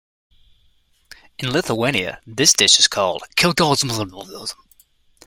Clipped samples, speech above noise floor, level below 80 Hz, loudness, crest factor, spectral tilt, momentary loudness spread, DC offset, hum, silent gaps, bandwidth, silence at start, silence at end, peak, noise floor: under 0.1%; 40 dB; -52 dBFS; -16 LUFS; 20 dB; -2 dB/octave; 19 LU; under 0.1%; none; none; 16.5 kHz; 1.4 s; 0.75 s; 0 dBFS; -58 dBFS